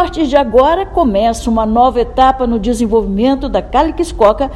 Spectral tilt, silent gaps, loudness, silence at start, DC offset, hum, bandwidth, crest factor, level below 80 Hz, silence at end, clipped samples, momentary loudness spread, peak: -6 dB/octave; none; -12 LUFS; 0 s; under 0.1%; none; 13 kHz; 12 dB; -26 dBFS; 0 s; 0.3%; 4 LU; 0 dBFS